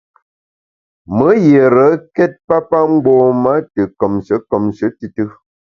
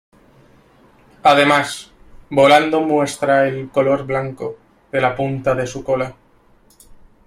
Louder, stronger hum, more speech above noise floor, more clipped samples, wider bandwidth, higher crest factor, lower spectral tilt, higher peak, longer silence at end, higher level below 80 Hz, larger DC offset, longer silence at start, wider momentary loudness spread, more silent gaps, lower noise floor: first, -13 LUFS vs -17 LUFS; neither; first, over 78 dB vs 36 dB; neither; second, 6.8 kHz vs 14 kHz; about the same, 14 dB vs 18 dB; first, -9.5 dB/octave vs -5 dB/octave; about the same, 0 dBFS vs 0 dBFS; second, 0.5 s vs 1.15 s; about the same, -50 dBFS vs -50 dBFS; neither; second, 1.1 s vs 1.25 s; about the same, 12 LU vs 14 LU; first, 2.44-2.48 s vs none; first, under -90 dBFS vs -52 dBFS